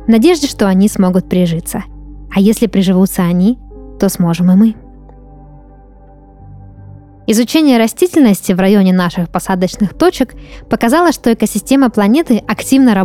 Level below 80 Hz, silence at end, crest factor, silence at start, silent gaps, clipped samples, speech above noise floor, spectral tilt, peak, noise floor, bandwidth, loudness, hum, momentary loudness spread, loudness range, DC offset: -36 dBFS; 0 s; 12 dB; 0 s; none; under 0.1%; 28 dB; -6 dB/octave; 0 dBFS; -39 dBFS; 16 kHz; -12 LUFS; none; 9 LU; 5 LU; 0.2%